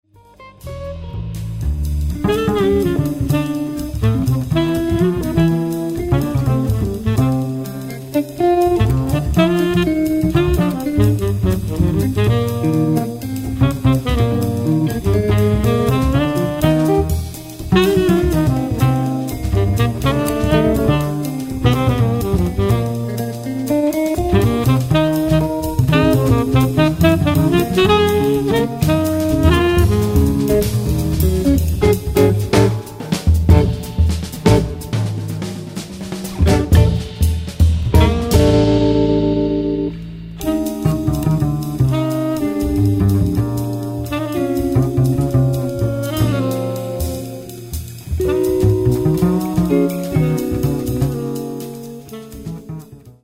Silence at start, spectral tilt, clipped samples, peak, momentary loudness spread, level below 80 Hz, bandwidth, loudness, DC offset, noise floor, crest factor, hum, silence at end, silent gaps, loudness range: 0.4 s; -7 dB/octave; under 0.1%; 0 dBFS; 10 LU; -26 dBFS; 16.5 kHz; -17 LUFS; under 0.1%; -43 dBFS; 16 dB; none; 0.15 s; none; 4 LU